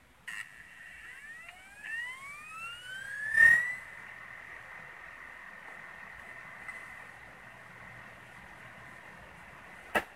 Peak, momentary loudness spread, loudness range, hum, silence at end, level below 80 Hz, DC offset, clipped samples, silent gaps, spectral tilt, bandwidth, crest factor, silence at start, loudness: -12 dBFS; 20 LU; 18 LU; none; 0 s; -66 dBFS; under 0.1%; under 0.1%; none; -2 dB/octave; 16 kHz; 24 dB; 0.25 s; -29 LUFS